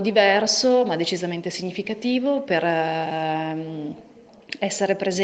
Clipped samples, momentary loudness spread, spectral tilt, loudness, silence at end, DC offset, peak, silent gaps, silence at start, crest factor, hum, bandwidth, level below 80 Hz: under 0.1%; 13 LU; -4 dB/octave; -22 LUFS; 0 s; under 0.1%; -4 dBFS; none; 0 s; 20 dB; none; 9.2 kHz; -68 dBFS